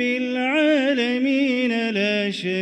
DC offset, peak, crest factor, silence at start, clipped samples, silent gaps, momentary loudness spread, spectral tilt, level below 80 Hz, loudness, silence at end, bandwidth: under 0.1%; -8 dBFS; 12 dB; 0 s; under 0.1%; none; 4 LU; -5 dB/octave; -68 dBFS; -20 LUFS; 0 s; 9.4 kHz